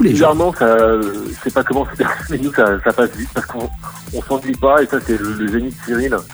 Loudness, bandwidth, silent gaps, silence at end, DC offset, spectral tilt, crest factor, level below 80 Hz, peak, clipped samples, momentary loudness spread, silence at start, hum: -16 LUFS; over 20 kHz; none; 0 s; under 0.1%; -6 dB/octave; 16 dB; -34 dBFS; 0 dBFS; under 0.1%; 11 LU; 0 s; none